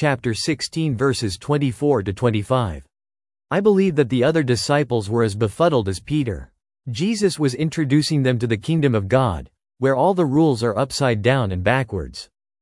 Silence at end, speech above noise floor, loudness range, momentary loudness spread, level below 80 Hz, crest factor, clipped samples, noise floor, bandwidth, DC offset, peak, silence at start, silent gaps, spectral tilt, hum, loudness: 0.4 s; over 71 dB; 2 LU; 7 LU; -46 dBFS; 18 dB; under 0.1%; under -90 dBFS; 12 kHz; under 0.1%; -2 dBFS; 0 s; none; -6 dB/octave; none; -20 LUFS